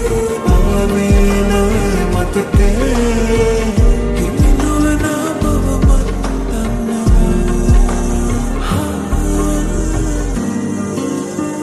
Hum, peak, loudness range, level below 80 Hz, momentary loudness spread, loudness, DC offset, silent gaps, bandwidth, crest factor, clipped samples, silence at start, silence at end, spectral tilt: none; -2 dBFS; 3 LU; -16 dBFS; 6 LU; -15 LUFS; under 0.1%; none; 13 kHz; 12 dB; under 0.1%; 0 s; 0 s; -6 dB/octave